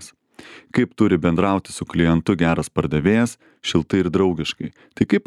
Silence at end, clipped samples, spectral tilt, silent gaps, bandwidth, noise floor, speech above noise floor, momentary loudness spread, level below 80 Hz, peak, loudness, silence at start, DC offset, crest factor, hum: 0.05 s; under 0.1%; -6.5 dB/octave; none; 12.5 kHz; -44 dBFS; 25 dB; 8 LU; -44 dBFS; -2 dBFS; -20 LUFS; 0 s; under 0.1%; 18 dB; none